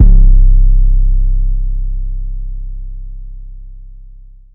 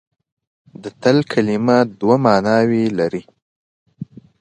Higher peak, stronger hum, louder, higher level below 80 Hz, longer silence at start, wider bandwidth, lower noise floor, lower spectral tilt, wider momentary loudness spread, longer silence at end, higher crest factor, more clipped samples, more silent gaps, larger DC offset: about the same, 0 dBFS vs 0 dBFS; neither; about the same, -16 LUFS vs -16 LUFS; first, -10 dBFS vs -58 dBFS; second, 0 s vs 0.8 s; second, 0.6 kHz vs 9.2 kHz; about the same, -35 dBFS vs -35 dBFS; first, -13.5 dB/octave vs -7 dB/octave; about the same, 23 LU vs 22 LU; first, 0.65 s vs 0.35 s; second, 10 dB vs 18 dB; first, 2% vs under 0.1%; second, none vs 3.42-3.86 s; neither